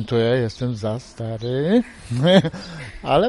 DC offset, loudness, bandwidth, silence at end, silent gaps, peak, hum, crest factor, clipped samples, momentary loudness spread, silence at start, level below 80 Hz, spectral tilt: under 0.1%; -21 LUFS; 11.5 kHz; 0 s; none; -2 dBFS; none; 18 dB; under 0.1%; 15 LU; 0 s; -46 dBFS; -7 dB/octave